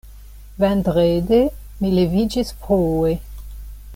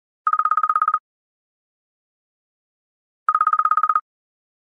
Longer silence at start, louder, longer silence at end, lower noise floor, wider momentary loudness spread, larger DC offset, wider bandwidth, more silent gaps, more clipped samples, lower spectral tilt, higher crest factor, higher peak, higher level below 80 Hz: second, 0.05 s vs 0.25 s; about the same, -19 LUFS vs -19 LUFS; second, 0 s vs 0.7 s; second, -39 dBFS vs under -90 dBFS; first, 18 LU vs 7 LU; neither; first, 17 kHz vs 4.2 kHz; second, none vs 1.00-3.26 s; neither; first, -7.5 dB/octave vs -1.5 dB/octave; about the same, 14 dB vs 18 dB; about the same, -6 dBFS vs -4 dBFS; first, -34 dBFS vs under -90 dBFS